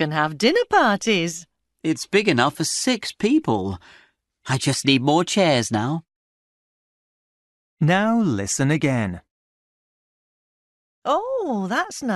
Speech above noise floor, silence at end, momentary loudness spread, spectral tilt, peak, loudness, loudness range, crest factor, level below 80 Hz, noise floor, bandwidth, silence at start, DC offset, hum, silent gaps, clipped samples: over 70 dB; 0 s; 11 LU; -4.5 dB/octave; -4 dBFS; -21 LUFS; 5 LU; 20 dB; -58 dBFS; under -90 dBFS; 12 kHz; 0 s; under 0.1%; none; 6.16-7.77 s, 9.31-11.02 s; under 0.1%